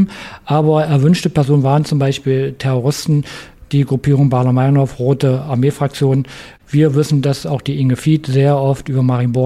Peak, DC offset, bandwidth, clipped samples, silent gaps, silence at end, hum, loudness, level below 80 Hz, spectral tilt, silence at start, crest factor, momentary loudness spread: -2 dBFS; under 0.1%; 13 kHz; under 0.1%; none; 0 s; none; -15 LUFS; -44 dBFS; -7.5 dB/octave; 0 s; 12 dB; 6 LU